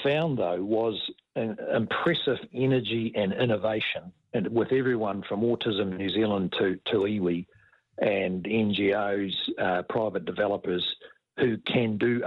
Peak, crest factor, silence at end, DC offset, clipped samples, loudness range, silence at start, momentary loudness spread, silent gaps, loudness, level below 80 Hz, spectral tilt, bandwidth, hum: -12 dBFS; 16 dB; 0 s; under 0.1%; under 0.1%; 1 LU; 0 s; 6 LU; none; -27 LUFS; -64 dBFS; -8.5 dB/octave; 5.6 kHz; none